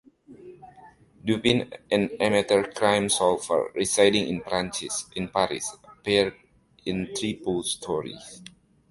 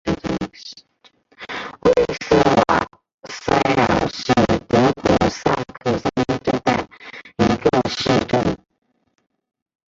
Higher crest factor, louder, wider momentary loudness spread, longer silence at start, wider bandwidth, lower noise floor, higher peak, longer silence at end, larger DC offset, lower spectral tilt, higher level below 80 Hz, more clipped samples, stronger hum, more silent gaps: about the same, 22 dB vs 18 dB; second, -25 LUFS vs -19 LUFS; about the same, 13 LU vs 15 LU; first, 0.3 s vs 0.05 s; first, 11.5 kHz vs 7.8 kHz; second, -52 dBFS vs -56 dBFS; about the same, -4 dBFS vs -2 dBFS; second, 0.45 s vs 1.35 s; neither; second, -3.5 dB/octave vs -5.5 dB/octave; second, -56 dBFS vs -42 dBFS; neither; neither; second, none vs 3.14-3.18 s